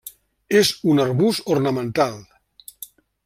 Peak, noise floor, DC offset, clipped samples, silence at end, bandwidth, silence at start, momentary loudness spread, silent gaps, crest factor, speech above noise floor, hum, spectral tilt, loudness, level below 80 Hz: -4 dBFS; -47 dBFS; under 0.1%; under 0.1%; 0.4 s; 16 kHz; 0.05 s; 22 LU; none; 18 dB; 28 dB; none; -5 dB/octave; -19 LUFS; -60 dBFS